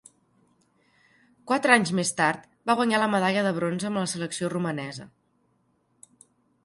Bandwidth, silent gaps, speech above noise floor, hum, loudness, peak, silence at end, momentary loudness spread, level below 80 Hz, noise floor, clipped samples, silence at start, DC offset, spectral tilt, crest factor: 11.5 kHz; none; 44 dB; none; -25 LUFS; -2 dBFS; 1.55 s; 11 LU; -70 dBFS; -69 dBFS; under 0.1%; 1.45 s; under 0.1%; -4.5 dB/octave; 24 dB